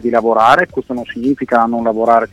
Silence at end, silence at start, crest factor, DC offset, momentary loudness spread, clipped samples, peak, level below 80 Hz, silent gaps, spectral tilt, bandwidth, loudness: 0.05 s; 0 s; 14 dB; under 0.1%; 9 LU; under 0.1%; 0 dBFS; -48 dBFS; none; -6 dB/octave; 12.5 kHz; -14 LUFS